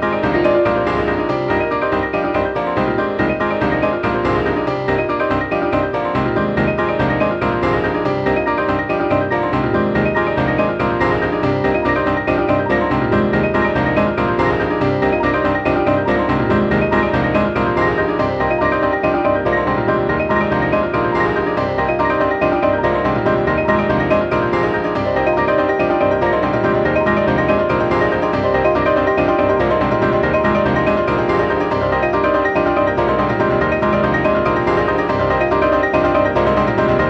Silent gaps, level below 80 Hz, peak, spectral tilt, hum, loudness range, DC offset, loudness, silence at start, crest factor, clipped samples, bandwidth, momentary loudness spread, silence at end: none; -34 dBFS; -2 dBFS; -8 dB/octave; none; 2 LU; under 0.1%; -16 LUFS; 0 s; 14 dB; under 0.1%; 8 kHz; 3 LU; 0 s